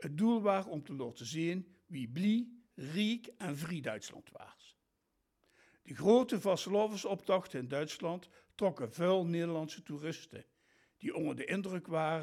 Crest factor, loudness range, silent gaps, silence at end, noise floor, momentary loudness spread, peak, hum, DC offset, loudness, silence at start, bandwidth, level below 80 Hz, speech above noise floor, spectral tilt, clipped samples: 20 dB; 5 LU; none; 0 s; -82 dBFS; 16 LU; -16 dBFS; none; under 0.1%; -36 LUFS; 0 s; 15 kHz; -80 dBFS; 47 dB; -6 dB/octave; under 0.1%